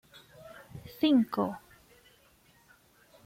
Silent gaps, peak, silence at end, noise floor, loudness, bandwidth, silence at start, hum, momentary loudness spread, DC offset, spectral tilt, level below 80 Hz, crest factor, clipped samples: none; -14 dBFS; 1.65 s; -63 dBFS; -28 LUFS; 16.5 kHz; 0.45 s; none; 25 LU; under 0.1%; -6.5 dB/octave; -68 dBFS; 20 dB; under 0.1%